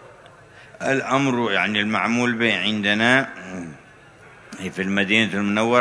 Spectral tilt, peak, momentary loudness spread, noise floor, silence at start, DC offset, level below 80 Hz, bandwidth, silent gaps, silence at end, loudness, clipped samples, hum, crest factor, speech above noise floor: -4.5 dB/octave; -2 dBFS; 16 LU; -47 dBFS; 0 s; under 0.1%; -62 dBFS; 11 kHz; none; 0 s; -20 LUFS; under 0.1%; none; 20 dB; 26 dB